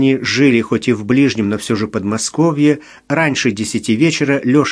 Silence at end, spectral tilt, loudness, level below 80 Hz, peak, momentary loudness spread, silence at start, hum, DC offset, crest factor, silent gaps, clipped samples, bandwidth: 0 s; -5 dB/octave; -15 LUFS; -52 dBFS; 0 dBFS; 6 LU; 0 s; none; under 0.1%; 14 dB; none; under 0.1%; 11 kHz